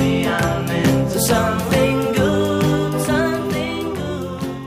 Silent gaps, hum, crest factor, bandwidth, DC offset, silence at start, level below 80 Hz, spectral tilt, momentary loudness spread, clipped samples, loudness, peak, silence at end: none; none; 16 dB; 15.5 kHz; under 0.1%; 0 s; -38 dBFS; -5.5 dB/octave; 7 LU; under 0.1%; -19 LUFS; -2 dBFS; 0 s